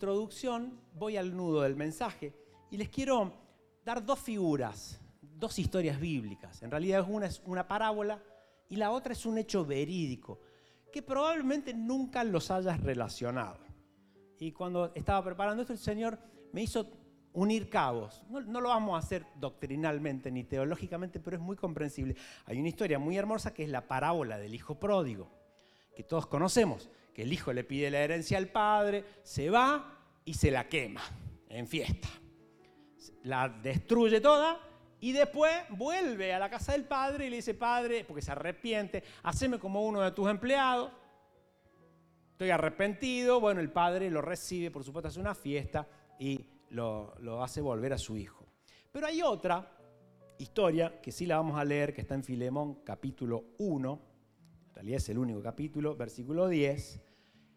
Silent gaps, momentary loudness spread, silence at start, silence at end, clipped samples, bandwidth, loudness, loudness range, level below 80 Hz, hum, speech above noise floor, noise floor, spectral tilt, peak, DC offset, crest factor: none; 14 LU; 0 s; 0.55 s; under 0.1%; 15.5 kHz; -34 LUFS; 6 LU; -54 dBFS; none; 34 dB; -67 dBFS; -5.5 dB/octave; -12 dBFS; under 0.1%; 22 dB